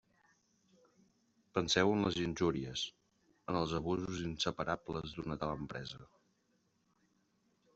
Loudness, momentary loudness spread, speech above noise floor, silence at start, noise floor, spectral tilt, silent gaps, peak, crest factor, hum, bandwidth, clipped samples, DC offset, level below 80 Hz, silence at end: -37 LUFS; 12 LU; 41 dB; 1.55 s; -77 dBFS; -4.5 dB/octave; none; -14 dBFS; 24 dB; none; 8.2 kHz; under 0.1%; under 0.1%; -62 dBFS; 1.7 s